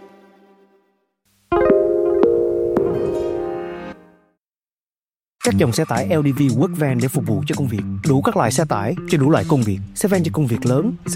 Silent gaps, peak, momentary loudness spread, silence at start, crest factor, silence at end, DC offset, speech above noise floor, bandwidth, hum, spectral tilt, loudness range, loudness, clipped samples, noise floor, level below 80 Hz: none; -2 dBFS; 7 LU; 0 s; 18 dB; 0 s; under 0.1%; over 72 dB; 16.5 kHz; none; -6.5 dB/octave; 5 LU; -18 LUFS; under 0.1%; under -90 dBFS; -48 dBFS